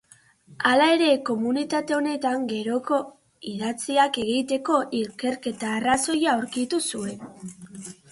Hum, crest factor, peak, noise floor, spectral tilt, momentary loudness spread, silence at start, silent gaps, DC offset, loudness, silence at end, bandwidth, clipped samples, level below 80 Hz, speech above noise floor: none; 20 dB; -6 dBFS; -55 dBFS; -3.5 dB/octave; 19 LU; 0.5 s; none; under 0.1%; -24 LUFS; 0.2 s; 11.5 kHz; under 0.1%; -64 dBFS; 31 dB